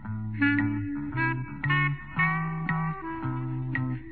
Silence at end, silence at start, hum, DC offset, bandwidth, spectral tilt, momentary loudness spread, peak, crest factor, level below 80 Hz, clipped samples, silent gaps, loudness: 0 s; 0 s; none; 0.4%; 4.5 kHz; -10.5 dB/octave; 7 LU; -12 dBFS; 16 dB; -52 dBFS; under 0.1%; none; -28 LUFS